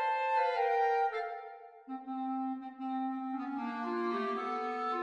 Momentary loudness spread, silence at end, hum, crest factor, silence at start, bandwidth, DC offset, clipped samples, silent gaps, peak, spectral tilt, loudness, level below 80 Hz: 13 LU; 0 s; none; 16 dB; 0 s; 9.4 kHz; under 0.1%; under 0.1%; none; -20 dBFS; -5 dB/octave; -34 LUFS; -84 dBFS